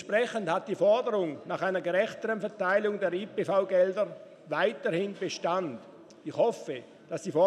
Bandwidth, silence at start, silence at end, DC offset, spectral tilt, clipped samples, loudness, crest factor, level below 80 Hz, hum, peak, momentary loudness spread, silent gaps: 11 kHz; 0 s; 0 s; under 0.1%; -5 dB/octave; under 0.1%; -29 LUFS; 16 dB; -84 dBFS; none; -12 dBFS; 13 LU; none